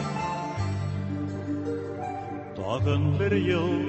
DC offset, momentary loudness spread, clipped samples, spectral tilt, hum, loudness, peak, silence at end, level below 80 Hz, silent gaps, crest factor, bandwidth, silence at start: under 0.1%; 10 LU; under 0.1%; -7.5 dB/octave; none; -29 LUFS; -12 dBFS; 0 s; -44 dBFS; none; 16 dB; 8.4 kHz; 0 s